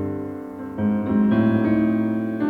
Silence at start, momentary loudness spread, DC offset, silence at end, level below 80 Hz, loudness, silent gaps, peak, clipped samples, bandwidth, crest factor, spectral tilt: 0 s; 14 LU; under 0.1%; 0 s; -52 dBFS; -21 LUFS; none; -8 dBFS; under 0.1%; 4.4 kHz; 14 dB; -10 dB/octave